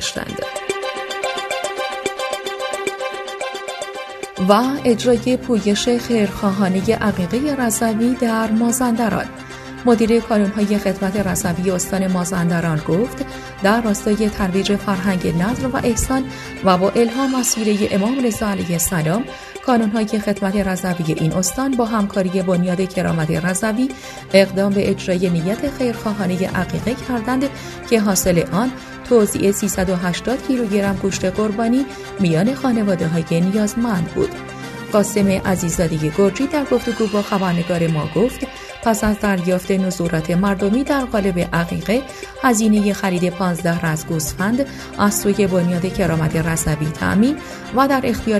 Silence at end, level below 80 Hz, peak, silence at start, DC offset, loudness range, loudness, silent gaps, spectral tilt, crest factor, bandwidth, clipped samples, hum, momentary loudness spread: 0 s; -40 dBFS; 0 dBFS; 0 s; under 0.1%; 2 LU; -18 LUFS; none; -5 dB/octave; 18 dB; 14 kHz; under 0.1%; none; 8 LU